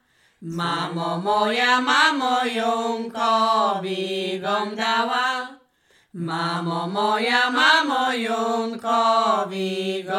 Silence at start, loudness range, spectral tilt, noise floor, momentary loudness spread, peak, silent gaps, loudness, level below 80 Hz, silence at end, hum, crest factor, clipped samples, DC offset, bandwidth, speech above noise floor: 0.4 s; 4 LU; -4 dB/octave; -61 dBFS; 9 LU; -4 dBFS; none; -21 LUFS; -70 dBFS; 0 s; none; 18 dB; under 0.1%; under 0.1%; 16 kHz; 39 dB